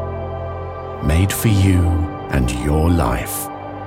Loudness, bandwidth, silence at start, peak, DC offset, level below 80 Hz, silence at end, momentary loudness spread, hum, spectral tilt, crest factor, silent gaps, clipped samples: -19 LUFS; 17 kHz; 0 s; -2 dBFS; under 0.1%; -28 dBFS; 0 s; 12 LU; none; -6 dB/octave; 14 dB; none; under 0.1%